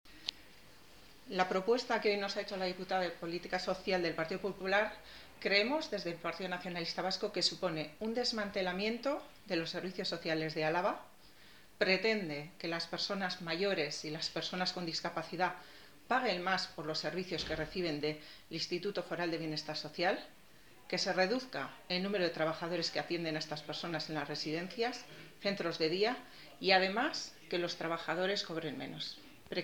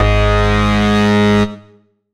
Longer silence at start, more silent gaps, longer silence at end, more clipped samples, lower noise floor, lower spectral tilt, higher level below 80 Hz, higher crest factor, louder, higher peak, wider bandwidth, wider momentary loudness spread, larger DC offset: about the same, 0.05 s vs 0 s; neither; second, 0 s vs 0.55 s; neither; first, -62 dBFS vs -49 dBFS; second, -4 dB/octave vs -6.5 dB/octave; second, -68 dBFS vs -20 dBFS; first, 24 dB vs 12 dB; second, -36 LUFS vs -13 LUFS; second, -14 dBFS vs 0 dBFS; first, 20 kHz vs 11.5 kHz; first, 9 LU vs 3 LU; neither